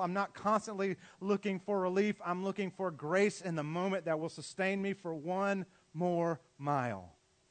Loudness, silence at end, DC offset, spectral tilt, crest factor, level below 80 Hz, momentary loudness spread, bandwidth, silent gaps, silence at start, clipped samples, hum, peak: -35 LUFS; 0.4 s; under 0.1%; -6 dB/octave; 18 dB; -80 dBFS; 7 LU; 9 kHz; none; 0 s; under 0.1%; none; -16 dBFS